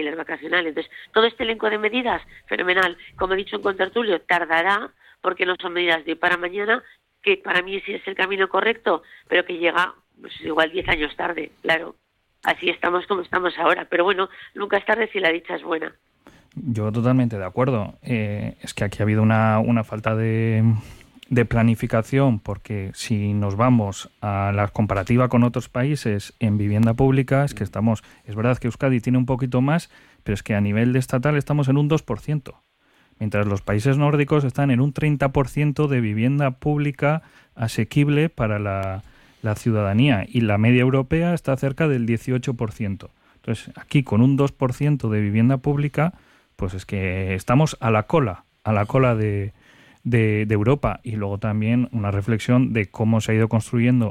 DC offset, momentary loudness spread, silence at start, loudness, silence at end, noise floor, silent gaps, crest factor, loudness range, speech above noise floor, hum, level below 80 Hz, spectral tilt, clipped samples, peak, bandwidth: under 0.1%; 9 LU; 0 s; -21 LUFS; 0 s; -60 dBFS; none; 16 dB; 2 LU; 39 dB; none; -46 dBFS; -7 dB/octave; under 0.1%; -6 dBFS; 13.5 kHz